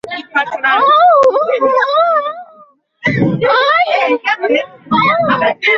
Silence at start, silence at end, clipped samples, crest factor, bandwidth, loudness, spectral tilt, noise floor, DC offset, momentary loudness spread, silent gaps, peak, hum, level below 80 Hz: 0.05 s; 0 s; under 0.1%; 12 dB; 7.4 kHz; -12 LUFS; -6 dB/octave; -45 dBFS; under 0.1%; 9 LU; none; -2 dBFS; none; -54 dBFS